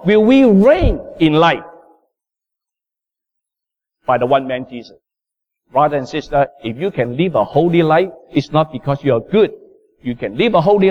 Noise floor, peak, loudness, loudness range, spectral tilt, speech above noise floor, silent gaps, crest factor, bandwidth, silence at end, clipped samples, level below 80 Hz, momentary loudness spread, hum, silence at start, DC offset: -86 dBFS; -2 dBFS; -15 LUFS; 7 LU; -8 dB/octave; 72 dB; none; 14 dB; 8 kHz; 0 s; under 0.1%; -34 dBFS; 13 LU; none; 0 s; under 0.1%